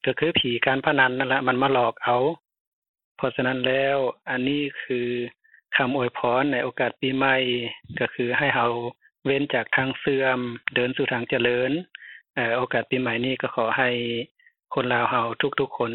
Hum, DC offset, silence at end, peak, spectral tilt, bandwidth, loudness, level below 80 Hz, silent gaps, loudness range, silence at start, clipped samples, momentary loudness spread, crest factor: none; under 0.1%; 0 s; -4 dBFS; -9 dB/octave; 4.3 kHz; -24 LUFS; -62 dBFS; 2.60-2.82 s, 2.89-2.94 s, 3.04-3.15 s, 14.31-14.35 s; 2 LU; 0.05 s; under 0.1%; 8 LU; 20 dB